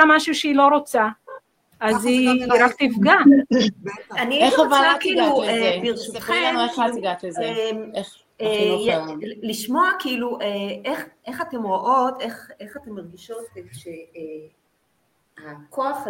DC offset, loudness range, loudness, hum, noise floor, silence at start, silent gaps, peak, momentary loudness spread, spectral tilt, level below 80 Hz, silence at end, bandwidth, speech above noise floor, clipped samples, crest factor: under 0.1%; 10 LU; -19 LUFS; none; -67 dBFS; 0 s; none; 0 dBFS; 21 LU; -4 dB/octave; -62 dBFS; 0 s; 16.5 kHz; 47 dB; under 0.1%; 20 dB